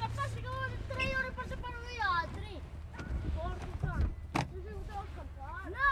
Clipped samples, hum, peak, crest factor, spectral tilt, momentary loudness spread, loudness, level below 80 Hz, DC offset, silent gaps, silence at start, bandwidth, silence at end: under 0.1%; none; -16 dBFS; 20 dB; -5.5 dB/octave; 12 LU; -38 LUFS; -42 dBFS; under 0.1%; none; 0 s; 13 kHz; 0 s